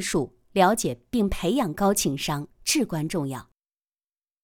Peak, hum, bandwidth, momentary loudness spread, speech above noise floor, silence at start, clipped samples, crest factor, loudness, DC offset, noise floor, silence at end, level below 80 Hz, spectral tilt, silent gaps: -6 dBFS; none; 19 kHz; 8 LU; over 65 dB; 0 s; under 0.1%; 20 dB; -25 LUFS; under 0.1%; under -90 dBFS; 1 s; -44 dBFS; -4 dB/octave; none